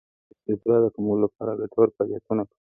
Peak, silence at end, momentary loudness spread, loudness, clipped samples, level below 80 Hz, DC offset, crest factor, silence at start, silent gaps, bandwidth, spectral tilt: -6 dBFS; 0.15 s; 8 LU; -24 LUFS; under 0.1%; -62 dBFS; under 0.1%; 18 dB; 0.5 s; none; 2.6 kHz; -14.5 dB/octave